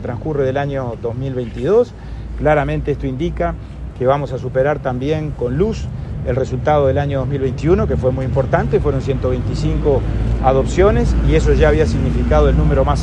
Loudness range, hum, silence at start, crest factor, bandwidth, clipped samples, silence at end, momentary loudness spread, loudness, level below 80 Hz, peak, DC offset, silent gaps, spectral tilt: 4 LU; none; 0 s; 16 dB; 8.8 kHz; under 0.1%; 0 s; 9 LU; -17 LUFS; -22 dBFS; 0 dBFS; under 0.1%; none; -8 dB/octave